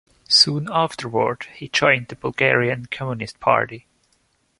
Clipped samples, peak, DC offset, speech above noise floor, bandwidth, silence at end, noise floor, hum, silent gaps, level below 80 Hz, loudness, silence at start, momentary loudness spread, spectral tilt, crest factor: under 0.1%; -2 dBFS; under 0.1%; 44 dB; 11.5 kHz; 0.8 s; -65 dBFS; none; none; -56 dBFS; -19 LUFS; 0.3 s; 14 LU; -3.5 dB/octave; 20 dB